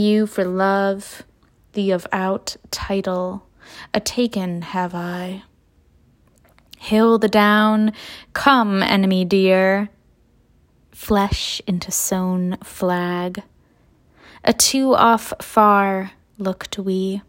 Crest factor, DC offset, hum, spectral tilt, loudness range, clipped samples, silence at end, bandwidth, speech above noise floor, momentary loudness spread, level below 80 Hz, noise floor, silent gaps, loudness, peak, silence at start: 20 dB; under 0.1%; none; -4.5 dB/octave; 8 LU; under 0.1%; 0.1 s; 16.5 kHz; 38 dB; 14 LU; -46 dBFS; -56 dBFS; none; -19 LUFS; 0 dBFS; 0 s